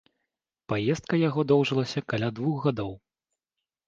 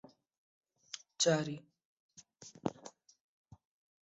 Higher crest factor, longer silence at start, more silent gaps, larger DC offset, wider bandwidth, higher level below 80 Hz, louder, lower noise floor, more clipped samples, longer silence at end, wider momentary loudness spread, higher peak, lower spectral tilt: second, 18 dB vs 26 dB; second, 0.7 s vs 0.95 s; second, none vs 1.85-2.09 s; neither; about the same, 7.6 kHz vs 8 kHz; first, -60 dBFS vs -78 dBFS; first, -27 LUFS vs -36 LUFS; first, -88 dBFS vs -58 dBFS; neither; second, 0.9 s vs 1.15 s; second, 8 LU vs 24 LU; first, -10 dBFS vs -16 dBFS; first, -7 dB/octave vs -4 dB/octave